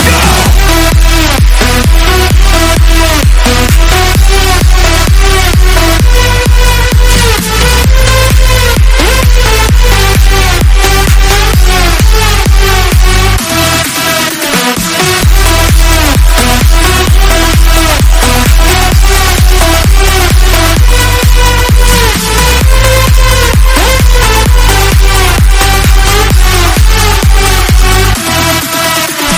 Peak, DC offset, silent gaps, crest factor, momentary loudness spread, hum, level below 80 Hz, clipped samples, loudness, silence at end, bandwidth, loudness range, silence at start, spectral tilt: 0 dBFS; under 0.1%; none; 4 dB; 1 LU; none; -6 dBFS; 10%; -7 LUFS; 0 s; 17.5 kHz; 1 LU; 0 s; -3.5 dB/octave